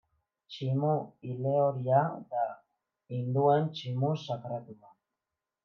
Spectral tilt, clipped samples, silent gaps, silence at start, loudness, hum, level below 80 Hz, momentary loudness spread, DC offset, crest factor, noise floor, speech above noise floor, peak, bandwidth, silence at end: -8.5 dB/octave; under 0.1%; none; 0.5 s; -31 LUFS; none; -82 dBFS; 14 LU; under 0.1%; 18 dB; -89 dBFS; 59 dB; -14 dBFS; 6.8 kHz; 0.9 s